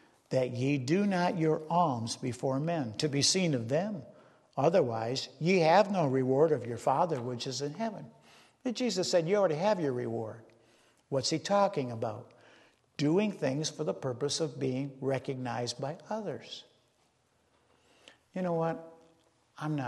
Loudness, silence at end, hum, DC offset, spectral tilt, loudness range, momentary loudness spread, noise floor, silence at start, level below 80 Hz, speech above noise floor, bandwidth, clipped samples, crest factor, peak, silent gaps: -31 LUFS; 0 s; none; under 0.1%; -5 dB/octave; 10 LU; 12 LU; -71 dBFS; 0.3 s; -74 dBFS; 41 dB; 12.5 kHz; under 0.1%; 20 dB; -12 dBFS; none